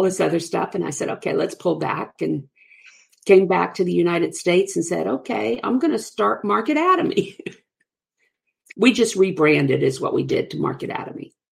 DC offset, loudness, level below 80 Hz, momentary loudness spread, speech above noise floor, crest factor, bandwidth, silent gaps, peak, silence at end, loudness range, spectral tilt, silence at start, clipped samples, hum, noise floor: under 0.1%; -20 LUFS; -64 dBFS; 11 LU; 54 dB; 18 dB; 15 kHz; none; -2 dBFS; 0.3 s; 2 LU; -5.5 dB/octave; 0 s; under 0.1%; none; -74 dBFS